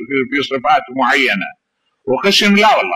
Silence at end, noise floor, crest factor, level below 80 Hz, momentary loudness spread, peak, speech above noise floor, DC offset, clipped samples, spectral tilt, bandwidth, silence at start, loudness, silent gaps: 0 s; -63 dBFS; 12 dB; -56 dBFS; 10 LU; -2 dBFS; 49 dB; under 0.1%; under 0.1%; -3.5 dB/octave; 15.5 kHz; 0 s; -13 LUFS; none